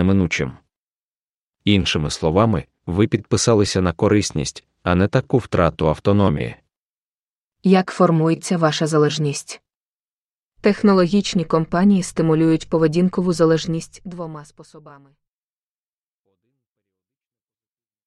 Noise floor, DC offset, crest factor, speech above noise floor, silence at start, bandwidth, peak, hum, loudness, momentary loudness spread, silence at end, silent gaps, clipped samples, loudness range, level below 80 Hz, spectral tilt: under -90 dBFS; under 0.1%; 20 dB; over 72 dB; 0 s; 11.5 kHz; 0 dBFS; none; -18 LUFS; 12 LU; 3.15 s; 0.78-1.53 s, 6.77-7.50 s, 9.76-10.52 s; under 0.1%; 4 LU; -44 dBFS; -6 dB/octave